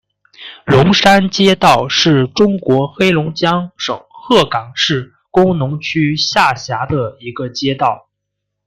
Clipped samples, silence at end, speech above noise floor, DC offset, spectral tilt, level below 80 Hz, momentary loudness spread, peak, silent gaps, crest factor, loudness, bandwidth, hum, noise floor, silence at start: under 0.1%; 0.7 s; 62 dB; under 0.1%; -5 dB/octave; -46 dBFS; 12 LU; 0 dBFS; none; 14 dB; -13 LUFS; 15 kHz; none; -75 dBFS; 0.4 s